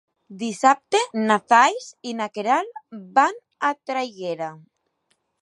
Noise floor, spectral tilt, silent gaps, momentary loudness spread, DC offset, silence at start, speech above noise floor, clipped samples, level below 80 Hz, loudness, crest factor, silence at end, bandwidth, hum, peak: -71 dBFS; -3 dB/octave; none; 16 LU; under 0.1%; 0.3 s; 49 dB; under 0.1%; -80 dBFS; -21 LUFS; 20 dB; 0.85 s; 11.5 kHz; none; -2 dBFS